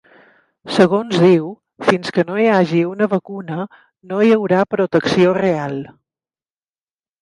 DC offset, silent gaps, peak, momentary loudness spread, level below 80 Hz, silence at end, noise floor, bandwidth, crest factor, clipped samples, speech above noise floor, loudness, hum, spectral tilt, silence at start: under 0.1%; none; 0 dBFS; 13 LU; -60 dBFS; 1.35 s; under -90 dBFS; 11 kHz; 18 dB; under 0.1%; over 74 dB; -16 LUFS; none; -7 dB/octave; 0.65 s